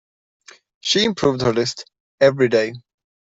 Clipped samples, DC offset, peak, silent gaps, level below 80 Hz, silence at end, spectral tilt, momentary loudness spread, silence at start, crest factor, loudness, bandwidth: under 0.1%; under 0.1%; -2 dBFS; 2.00-2.18 s; -56 dBFS; 0.6 s; -4.5 dB/octave; 11 LU; 0.85 s; 18 dB; -19 LUFS; 8 kHz